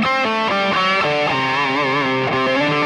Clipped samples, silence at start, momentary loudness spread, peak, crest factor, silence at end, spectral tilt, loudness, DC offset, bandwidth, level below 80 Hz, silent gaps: under 0.1%; 0 s; 2 LU; -6 dBFS; 12 dB; 0 s; -5 dB/octave; -17 LUFS; under 0.1%; 11 kHz; -54 dBFS; none